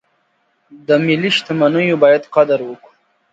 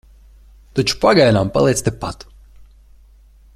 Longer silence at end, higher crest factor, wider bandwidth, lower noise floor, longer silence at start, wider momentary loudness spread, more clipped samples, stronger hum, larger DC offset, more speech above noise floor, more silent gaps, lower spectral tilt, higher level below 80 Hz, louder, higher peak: second, 0.6 s vs 1.4 s; about the same, 16 dB vs 18 dB; second, 8 kHz vs 15 kHz; first, -63 dBFS vs -47 dBFS; about the same, 0.75 s vs 0.75 s; second, 8 LU vs 16 LU; neither; neither; neither; first, 49 dB vs 32 dB; neither; about the same, -6 dB/octave vs -5 dB/octave; second, -64 dBFS vs -40 dBFS; about the same, -14 LUFS vs -16 LUFS; about the same, 0 dBFS vs -2 dBFS